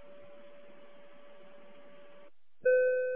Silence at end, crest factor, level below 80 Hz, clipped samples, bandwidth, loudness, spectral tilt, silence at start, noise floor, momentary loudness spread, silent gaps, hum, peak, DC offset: 0 s; 18 dB; -78 dBFS; under 0.1%; 3.6 kHz; -29 LUFS; -6.5 dB/octave; 2.65 s; -61 dBFS; 28 LU; none; none; -18 dBFS; 0.4%